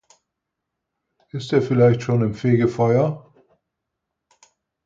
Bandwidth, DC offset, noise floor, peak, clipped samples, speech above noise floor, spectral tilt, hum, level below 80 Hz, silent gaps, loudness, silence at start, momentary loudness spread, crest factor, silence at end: 7.6 kHz; under 0.1%; -81 dBFS; -4 dBFS; under 0.1%; 63 dB; -8.5 dB/octave; none; -58 dBFS; none; -19 LUFS; 1.35 s; 15 LU; 18 dB; 1.7 s